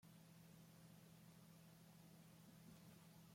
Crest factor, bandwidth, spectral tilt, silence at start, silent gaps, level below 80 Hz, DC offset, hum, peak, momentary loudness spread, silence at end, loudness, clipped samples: 12 dB; 16.5 kHz; -5 dB/octave; 0 s; none; -88 dBFS; under 0.1%; none; -54 dBFS; 1 LU; 0 s; -66 LUFS; under 0.1%